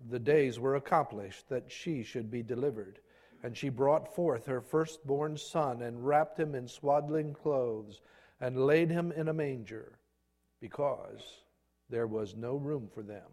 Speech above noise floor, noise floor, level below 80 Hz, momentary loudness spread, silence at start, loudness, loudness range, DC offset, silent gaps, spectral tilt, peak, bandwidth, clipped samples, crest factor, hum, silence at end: 44 dB; -77 dBFS; -70 dBFS; 17 LU; 0 s; -33 LUFS; 6 LU; under 0.1%; none; -7 dB/octave; -12 dBFS; 13.5 kHz; under 0.1%; 22 dB; none; 0.05 s